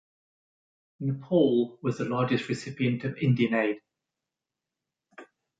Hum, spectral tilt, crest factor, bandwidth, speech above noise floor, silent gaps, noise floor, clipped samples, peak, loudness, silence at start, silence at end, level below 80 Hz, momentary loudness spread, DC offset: none; -7.5 dB/octave; 20 dB; 9.2 kHz; 62 dB; none; -88 dBFS; under 0.1%; -10 dBFS; -27 LUFS; 1 s; 0.35 s; -68 dBFS; 9 LU; under 0.1%